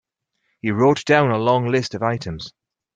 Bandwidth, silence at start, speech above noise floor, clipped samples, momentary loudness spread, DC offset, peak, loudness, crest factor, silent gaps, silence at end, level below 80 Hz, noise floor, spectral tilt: 9.2 kHz; 0.65 s; 54 dB; under 0.1%; 15 LU; under 0.1%; -2 dBFS; -19 LUFS; 18 dB; none; 0.45 s; -54 dBFS; -72 dBFS; -6 dB/octave